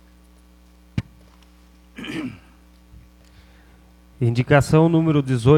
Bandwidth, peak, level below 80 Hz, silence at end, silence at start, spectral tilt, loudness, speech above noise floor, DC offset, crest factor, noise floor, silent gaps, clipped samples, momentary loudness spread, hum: 13 kHz; -2 dBFS; -46 dBFS; 0 s; 0.95 s; -7.5 dB/octave; -20 LUFS; 35 dB; under 0.1%; 20 dB; -50 dBFS; none; under 0.1%; 16 LU; 60 Hz at -50 dBFS